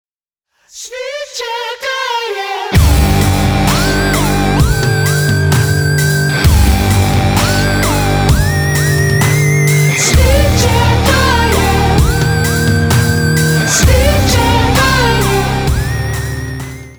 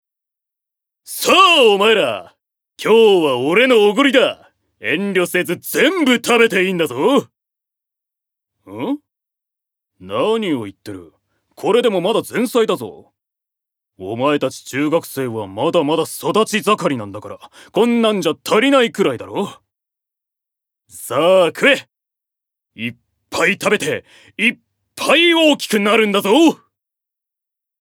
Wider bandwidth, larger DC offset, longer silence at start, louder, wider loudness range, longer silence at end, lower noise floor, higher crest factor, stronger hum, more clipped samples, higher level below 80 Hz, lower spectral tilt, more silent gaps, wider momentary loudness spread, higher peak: about the same, over 20 kHz vs 19 kHz; neither; second, 0.75 s vs 1.1 s; first, -11 LUFS vs -15 LUFS; second, 3 LU vs 8 LU; second, 0.05 s vs 1.25 s; second, -76 dBFS vs -84 dBFS; about the same, 12 dB vs 16 dB; neither; neither; first, -18 dBFS vs -66 dBFS; about the same, -4.5 dB/octave vs -4 dB/octave; neither; second, 9 LU vs 16 LU; about the same, 0 dBFS vs 0 dBFS